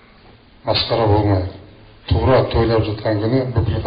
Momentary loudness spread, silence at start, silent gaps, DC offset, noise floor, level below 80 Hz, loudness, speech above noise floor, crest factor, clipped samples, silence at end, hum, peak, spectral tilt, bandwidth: 8 LU; 0.65 s; none; under 0.1%; -46 dBFS; -32 dBFS; -17 LUFS; 30 dB; 14 dB; under 0.1%; 0 s; none; -4 dBFS; -5.5 dB/octave; 5.2 kHz